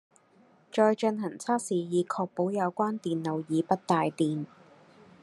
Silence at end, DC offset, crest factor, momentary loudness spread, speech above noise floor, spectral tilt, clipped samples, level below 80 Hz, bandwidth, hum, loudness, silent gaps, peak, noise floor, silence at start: 0.75 s; under 0.1%; 20 dB; 7 LU; 33 dB; -6 dB/octave; under 0.1%; -78 dBFS; 12.5 kHz; none; -29 LUFS; none; -8 dBFS; -61 dBFS; 0.75 s